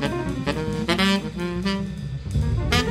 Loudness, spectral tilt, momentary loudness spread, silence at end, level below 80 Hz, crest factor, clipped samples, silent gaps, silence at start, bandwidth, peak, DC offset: -24 LUFS; -5.5 dB/octave; 8 LU; 0 s; -34 dBFS; 18 dB; under 0.1%; none; 0 s; 15.5 kHz; -6 dBFS; under 0.1%